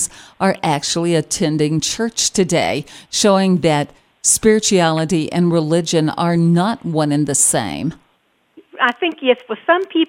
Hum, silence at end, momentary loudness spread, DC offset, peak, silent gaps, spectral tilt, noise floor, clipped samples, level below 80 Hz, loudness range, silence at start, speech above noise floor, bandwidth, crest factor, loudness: none; 0.05 s; 7 LU; under 0.1%; 0 dBFS; none; -4 dB/octave; -61 dBFS; under 0.1%; -50 dBFS; 2 LU; 0 s; 45 dB; 16.5 kHz; 16 dB; -16 LUFS